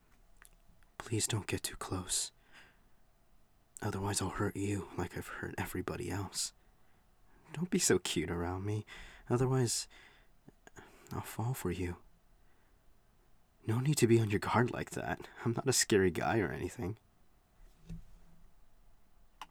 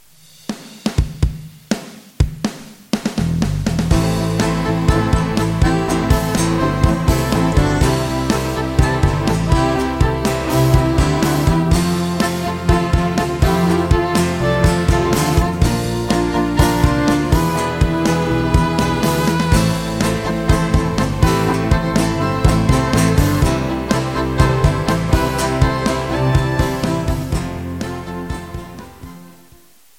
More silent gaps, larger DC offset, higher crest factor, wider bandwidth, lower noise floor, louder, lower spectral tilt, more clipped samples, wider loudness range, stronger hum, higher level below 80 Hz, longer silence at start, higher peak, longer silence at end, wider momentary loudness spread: neither; neither; first, 22 dB vs 16 dB; first, over 20 kHz vs 17 kHz; first, -66 dBFS vs -49 dBFS; second, -35 LUFS vs -17 LUFS; second, -4.5 dB/octave vs -6 dB/octave; neither; first, 9 LU vs 4 LU; neither; second, -60 dBFS vs -24 dBFS; first, 1 s vs 0.5 s; second, -14 dBFS vs 0 dBFS; second, 0.05 s vs 0.7 s; first, 18 LU vs 10 LU